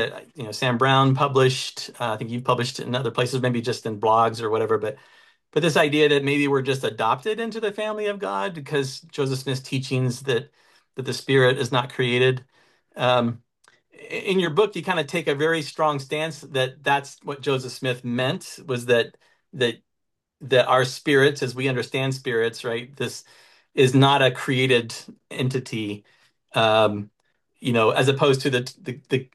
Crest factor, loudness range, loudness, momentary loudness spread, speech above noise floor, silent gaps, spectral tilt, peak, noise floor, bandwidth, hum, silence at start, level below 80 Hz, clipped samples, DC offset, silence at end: 18 dB; 4 LU; -22 LUFS; 12 LU; 58 dB; none; -5 dB/octave; -4 dBFS; -81 dBFS; 12.5 kHz; none; 0 s; -68 dBFS; under 0.1%; under 0.1%; 0.1 s